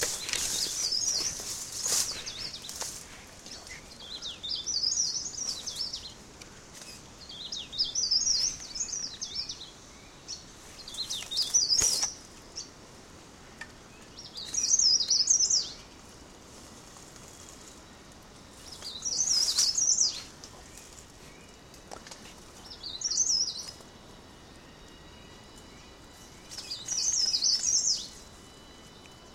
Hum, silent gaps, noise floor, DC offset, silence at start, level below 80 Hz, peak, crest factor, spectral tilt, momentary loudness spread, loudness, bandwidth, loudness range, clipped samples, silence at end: none; none; -51 dBFS; under 0.1%; 0 s; -58 dBFS; -6 dBFS; 26 dB; 1 dB/octave; 26 LU; -27 LUFS; 16 kHz; 8 LU; under 0.1%; 0 s